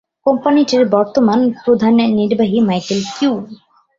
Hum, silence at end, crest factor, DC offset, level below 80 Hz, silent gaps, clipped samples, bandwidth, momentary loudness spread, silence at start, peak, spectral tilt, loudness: none; 0.45 s; 14 dB; under 0.1%; -56 dBFS; none; under 0.1%; 7.6 kHz; 6 LU; 0.25 s; 0 dBFS; -6 dB/octave; -14 LUFS